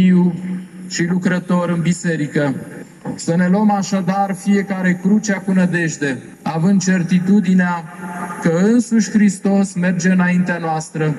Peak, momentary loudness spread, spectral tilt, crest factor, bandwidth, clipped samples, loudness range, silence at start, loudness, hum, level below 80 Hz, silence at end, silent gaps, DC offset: -4 dBFS; 11 LU; -6.5 dB/octave; 12 dB; 12 kHz; under 0.1%; 2 LU; 0 s; -17 LUFS; none; -60 dBFS; 0 s; none; under 0.1%